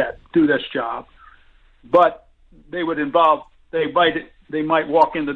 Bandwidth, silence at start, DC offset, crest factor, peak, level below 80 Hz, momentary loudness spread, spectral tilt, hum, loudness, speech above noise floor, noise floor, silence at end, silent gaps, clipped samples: 5.8 kHz; 0 s; under 0.1%; 18 dB; -2 dBFS; -52 dBFS; 12 LU; -7 dB/octave; none; -19 LUFS; 33 dB; -51 dBFS; 0 s; none; under 0.1%